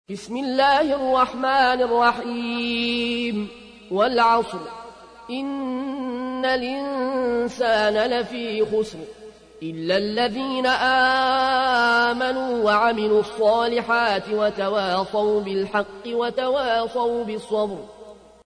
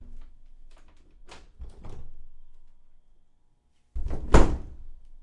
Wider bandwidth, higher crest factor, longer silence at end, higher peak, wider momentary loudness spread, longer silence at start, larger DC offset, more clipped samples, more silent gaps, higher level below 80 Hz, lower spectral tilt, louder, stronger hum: about the same, 10.5 kHz vs 10 kHz; second, 14 dB vs 26 dB; first, 0.3 s vs 0.05 s; second, -8 dBFS vs 0 dBFS; second, 11 LU vs 29 LU; about the same, 0.1 s vs 0 s; neither; neither; neither; second, -56 dBFS vs -30 dBFS; second, -4.5 dB/octave vs -6.5 dB/octave; first, -21 LUFS vs -26 LUFS; neither